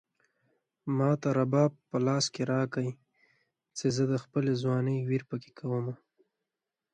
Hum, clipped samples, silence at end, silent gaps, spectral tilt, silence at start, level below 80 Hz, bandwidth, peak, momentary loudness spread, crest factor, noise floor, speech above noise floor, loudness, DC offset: none; under 0.1%; 1 s; none; -6 dB/octave; 0.85 s; -72 dBFS; 9.4 kHz; -12 dBFS; 11 LU; 20 dB; -89 dBFS; 60 dB; -30 LUFS; under 0.1%